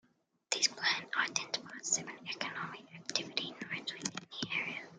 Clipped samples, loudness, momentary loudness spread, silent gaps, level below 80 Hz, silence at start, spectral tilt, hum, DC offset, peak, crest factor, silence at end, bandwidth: under 0.1%; -36 LUFS; 10 LU; none; -84 dBFS; 0.5 s; -0.5 dB/octave; none; under 0.1%; -12 dBFS; 28 dB; 0 s; 12.5 kHz